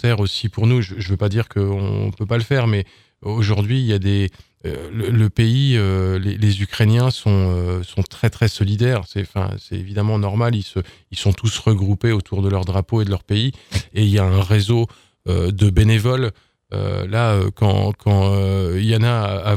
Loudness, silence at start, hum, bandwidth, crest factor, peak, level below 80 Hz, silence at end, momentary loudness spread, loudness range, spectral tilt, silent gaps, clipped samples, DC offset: -19 LUFS; 0.05 s; none; 13 kHz; 14 dB; -2 dBFS; -38 dBFS; 0 s; 9 LU; 3 LU; -7 dB/octave; none; under 0.1%; under 0.1%